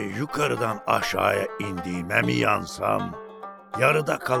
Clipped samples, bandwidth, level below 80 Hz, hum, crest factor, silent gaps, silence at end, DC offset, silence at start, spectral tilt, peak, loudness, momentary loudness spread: under 0.1%; 19 kHz; -58 dBFS; none; 20 dB; none; 0 s; under 0.1%; 0 s; -5 dB/octave; -4 dBFS; -24 LUFS; 13 LU